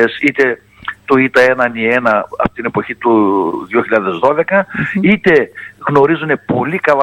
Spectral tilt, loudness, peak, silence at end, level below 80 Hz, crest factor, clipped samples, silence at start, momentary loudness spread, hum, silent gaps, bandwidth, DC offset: -7 dB/octave; -13 LUFS; 0 dBFS; 0 s; -46 dBFS; 14 dB; under 0.1%; 0 s; 8 LU; none; none; 12 kHz; under 0.1%